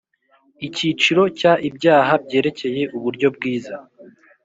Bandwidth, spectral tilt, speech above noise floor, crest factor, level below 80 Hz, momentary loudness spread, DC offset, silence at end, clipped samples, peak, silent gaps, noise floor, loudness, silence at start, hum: 8 kHz; -5 dB/octave; 41 dB; 18 dB; -62 dBFS; 13 LU; under 0.1%; 0.35 s; under 0.1%; -2 dBFS; none; -60 dBFS; -18 LUFS; 0.6 s; none